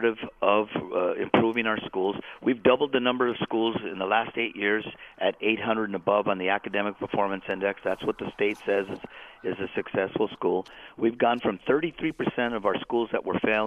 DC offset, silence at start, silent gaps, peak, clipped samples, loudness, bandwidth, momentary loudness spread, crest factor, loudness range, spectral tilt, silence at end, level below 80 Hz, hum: under 0.1%; 0 s; none; -2 dBFS; under 0.1%; -27 LUFS; 6.8 kHz; 6 LU; 24 dB; 4 LU; -7 dB/octave; 0 s; -62 dBFS; none